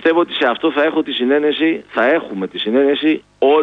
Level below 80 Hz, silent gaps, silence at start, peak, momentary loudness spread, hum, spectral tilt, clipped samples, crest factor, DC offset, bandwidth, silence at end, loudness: -62 dBFS; none; 0 s; -2 dBFS; 4 LU; none; -6.5 dB/octave; under 0.1%; 12 dB; under 0.1%; 5.6 kHz; 0 s; -16 LUFS